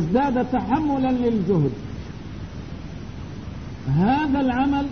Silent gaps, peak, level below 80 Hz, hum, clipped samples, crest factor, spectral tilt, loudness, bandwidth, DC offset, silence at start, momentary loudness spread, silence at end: none; -8 dBFS; -40 dBFS; none; under 0.1%; 14 dB; -8.5 dB/octave; -22 LUFS; 6.6 kHz; 0.5%; 0 s; 15 LU; 0 s